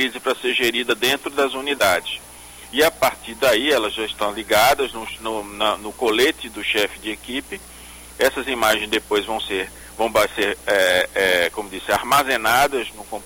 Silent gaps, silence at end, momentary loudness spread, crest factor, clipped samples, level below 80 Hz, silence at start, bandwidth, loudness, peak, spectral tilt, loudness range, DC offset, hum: none; 0 s; 12 LU; 16 dB; under 0.1%; -48 dBFS; 0 s; 17 kHz; -20 LUFS; -4 dBFS; -2 dB/octave; 3 LU; under 0.1%; none